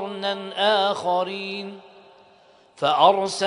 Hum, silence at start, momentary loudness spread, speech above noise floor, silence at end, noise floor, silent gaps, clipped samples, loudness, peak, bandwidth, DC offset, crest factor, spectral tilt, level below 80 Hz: none; 0 s; 13 LU; 33 dB; 0 s; -54 dBFS; none; under 0.1%; -22 LUFS; -2 dBFS; 10.5 kHz; under 0.1%; 22 dB; -3.5 dB/octave; -74 dBFS